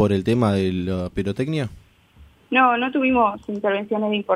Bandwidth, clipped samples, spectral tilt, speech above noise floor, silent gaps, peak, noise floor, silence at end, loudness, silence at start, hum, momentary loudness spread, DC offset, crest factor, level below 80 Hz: 12 kHz; under 0.1%; -7 dB/octave; 30 dB; none; -4 dBFS; -51 dBFS; 0 s; -21 LUFS; 0 s; none; 8 LU; under 0.1%; 16 dB; -48 dBFS